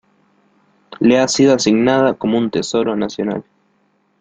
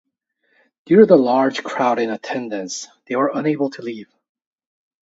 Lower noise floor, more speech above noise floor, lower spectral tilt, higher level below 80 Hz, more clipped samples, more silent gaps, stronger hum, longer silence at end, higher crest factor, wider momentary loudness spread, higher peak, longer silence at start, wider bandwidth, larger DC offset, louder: second, -61 dBFS vs -68 dBFS; second, 46 dB vs 50 dB; about the same, -4.5 dB/octave vs -5.5 dB/octave; first, -56 dBFS vs -68 dBFS; neither; neither; first, 50 Hz at -40 dBFS vs none; second, 0.8 s vs 1 s; about the same, 16 dB vs 20 dB; second, 9 LU vs 18 LU; about the same, -2 dBFS vs 0 dBFS; about the same, 0.9 s vs 0.9 s; first, 9.2 kHz vs 7.8 kHz; neither; first, -15 LUFS vs -18 LUFS